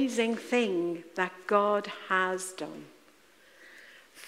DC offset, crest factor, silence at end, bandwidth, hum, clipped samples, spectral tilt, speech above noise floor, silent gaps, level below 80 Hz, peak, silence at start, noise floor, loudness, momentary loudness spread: under 0.1%; 20 dB; 0 s; 16 kHz; none; under 0.1%; -4 dB/octave; 30 dB; none; -82 dBFS; -10 dBFS; 0 s; -60 dBFS; -30 LUFS; 21 LU